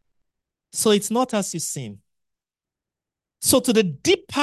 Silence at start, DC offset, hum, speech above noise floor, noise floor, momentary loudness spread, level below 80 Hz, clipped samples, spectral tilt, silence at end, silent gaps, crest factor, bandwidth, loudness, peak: 0.75 s; under 0.1%; none; 68 dB; -89 dBFS; 12 LU; -56 dBFS; under 0.1%; -3.5 dB/octave; 0 s; none; 20 dB; 13 kHz; -21 LUFS; -4 dBFS